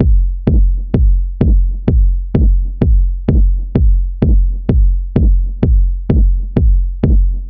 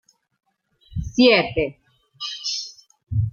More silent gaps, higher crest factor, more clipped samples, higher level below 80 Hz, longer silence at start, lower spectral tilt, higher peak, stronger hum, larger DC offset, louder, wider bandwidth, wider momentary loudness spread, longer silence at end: neither; second, 10 dB vs 20 dB; neither; first, -12 dBFS vs -42 dBFS; second, 0 s vs 0.9 s; first, -11 dB/octave vs -5 dB/octave; first, 0 dBFS vs -4 dBFS; neither; neither; first, -15 LUFS vs -21 LUFS; second, 2.9 kHz vs 7.2 kHz; second, 1 LU vs 17 LU; about the same, 0 s vs 0 s